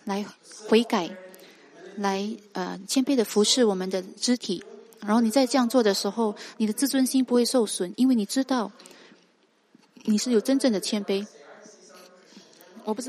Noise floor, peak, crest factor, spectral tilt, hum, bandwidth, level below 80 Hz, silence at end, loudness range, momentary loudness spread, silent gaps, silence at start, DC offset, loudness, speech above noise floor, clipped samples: -64 dBFS; -8 dBFS; 18 dB; -4 dB/octave; none; 15 kHz; -78 dBFS; 0 s; 4 LU; 13 LU; none; 0.05 s; under 0.1%; -25 LUFS; 40 dB; under 0.1%